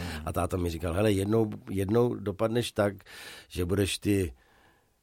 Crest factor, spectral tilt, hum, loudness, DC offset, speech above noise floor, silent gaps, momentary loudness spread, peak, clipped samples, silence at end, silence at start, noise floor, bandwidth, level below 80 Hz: 16 dB; -6 dB/octave; none; -29 LUFS; under 0.1%; 35 dB; none; 10 LU; -14 dBFS; under 0.1%; 0.7 s; 0 s; -63 dBFS; 16.5 kHz; -48 dBFS